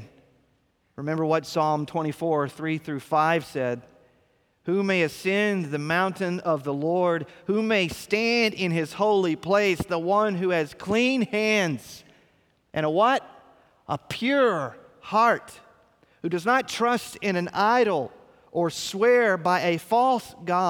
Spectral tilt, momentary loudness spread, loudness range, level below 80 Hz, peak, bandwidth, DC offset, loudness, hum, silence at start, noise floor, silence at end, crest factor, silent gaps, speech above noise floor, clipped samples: -5 dB/octave; 9 LU; 3 LU; -62 dBFS; -8 dBFS; 18.5 kHz; under 0.1%; -24 LUFS; none; 0 s; -68 dBFS; 0 s; 18 dB; none; 44 dB; under 0.1%